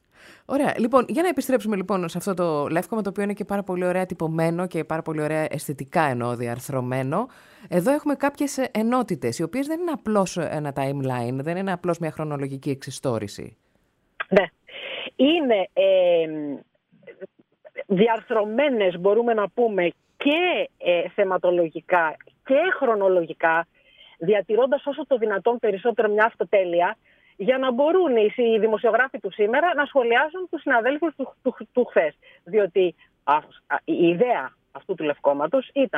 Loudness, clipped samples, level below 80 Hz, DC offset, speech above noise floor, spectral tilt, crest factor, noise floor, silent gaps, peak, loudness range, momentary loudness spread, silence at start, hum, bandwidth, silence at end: -23 LUFS; under 0.1%; -66 dBFS; under 0.1%; 44 dB; -6 dB/octave; 18 dB; -67 dBFS; none; -4 dBFS; 5 LU; 9 LU; 0.5 s; none; 15.5 kHz; 0 s